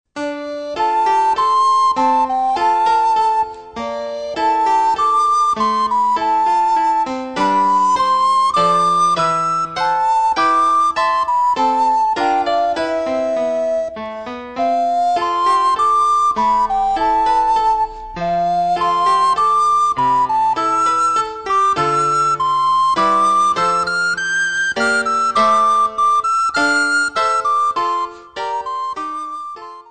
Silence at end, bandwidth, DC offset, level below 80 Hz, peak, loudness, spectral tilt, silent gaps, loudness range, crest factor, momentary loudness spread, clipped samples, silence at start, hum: 0.1 s; 9.4 kHz; 0.4%; -48 dBFS; -4 dBFS; -15 LUFS; -3 dB/octave; none; 2 LU; 12 dB; 10 LU; under 0.1%; 0.15 s; none